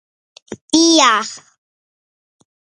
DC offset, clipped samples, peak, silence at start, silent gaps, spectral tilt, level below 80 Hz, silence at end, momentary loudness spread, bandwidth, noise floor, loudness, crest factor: under 0.1%; under 0.1%; 0 dBFS; 0.5 s; 0.61-0.68 s; -1 dB/octave; -62 dBFS; 1.25 s; 19 LU; 10 kHz; under -90 dBFS; -12 LUFS; 18 dB